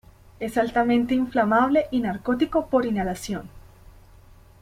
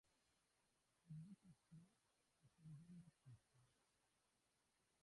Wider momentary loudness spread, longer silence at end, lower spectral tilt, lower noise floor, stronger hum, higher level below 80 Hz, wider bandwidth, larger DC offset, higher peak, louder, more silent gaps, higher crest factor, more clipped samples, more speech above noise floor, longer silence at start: first, 11 LU vs 8 LU; first, 1 s vs 0 s; about the same, -6 dB/octave vs -6.5 dB/octave; second, -50 dBFS vs -87 dBFS; neither; first, -48 dBFS vs under -90 dBFS; first, 16 kHz vs 11 kHz; neither; first, -8 dBFS vs -50 dBFS; first, -23 LUFS vs -64 LUFS; neither; about the same, 16 dB vs 18 dB; neither; first, 27 dB vs 20 dB; first, 0.4 s vs 0.05 s